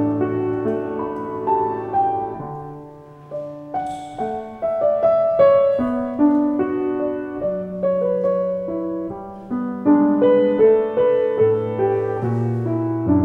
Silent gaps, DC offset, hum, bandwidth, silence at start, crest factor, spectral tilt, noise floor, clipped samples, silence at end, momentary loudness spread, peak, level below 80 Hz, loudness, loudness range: none; under 0.1%; none; 8 kHz; 0 s; 16 dB; -9.5 dB/octave; -40 dBFS; under 0.1%; 0 s; 13 LU; -4 dBFS; -54 dBFS; -20 LUFS; 7 LU